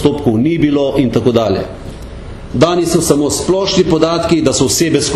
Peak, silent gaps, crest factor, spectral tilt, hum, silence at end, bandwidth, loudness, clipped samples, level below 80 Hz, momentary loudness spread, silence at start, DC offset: 0 dBFS; none; 12 dB; -5 dB/octave; none; 0 s; 14 kHz; -13 LUFS; under 0.1%; -34 dBFS; 15 LU; 0 s; under 0.1%